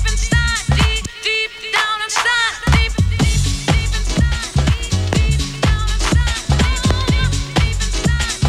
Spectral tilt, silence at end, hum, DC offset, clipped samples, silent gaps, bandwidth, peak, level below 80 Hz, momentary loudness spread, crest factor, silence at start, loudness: -4 dB/octave; 0 s; none; under 0.1%; under 0.1%; none; 14.5 kHz; -2 dBFS; -20 dBFS; 3 LU; 14 dB; 0 s; -17 LUFS